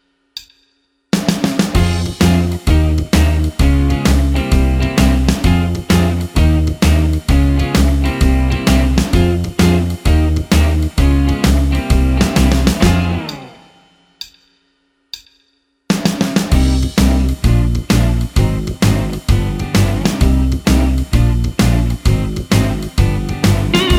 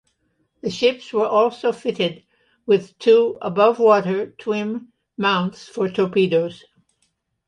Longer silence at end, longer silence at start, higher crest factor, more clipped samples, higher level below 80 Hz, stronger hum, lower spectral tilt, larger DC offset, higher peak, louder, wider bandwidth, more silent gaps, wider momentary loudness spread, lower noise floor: second, 0 s vs 0.9 s; second, 0.35 s vs 0.65 s; about the same, 14 dB vs 18 dB; neither; first, -16 dBFS vs -66 dBFS; neither; about the same, -6 dB/octave vs -6 dB/octave; neither; about the same, 0 dBFS vs -2 dBFS; first, -14 LUFS vs -20 LUFS; first, 16.5 kHz vs 9.8 kHz; neither; second, 4 LU vs 13 LU; second, -61 dBFS vs -69 dBFS